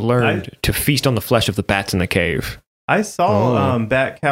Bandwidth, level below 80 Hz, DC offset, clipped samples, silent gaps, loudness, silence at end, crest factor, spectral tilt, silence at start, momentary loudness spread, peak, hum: 16.5 kHz; -38 dBFS; under 0.1%; under 0.1%; 2.67-2.88 s; -18 LUFS; 0 s; 16 dB; -5 dB/octave; 0 s; 5 LU; -2 dBFS; none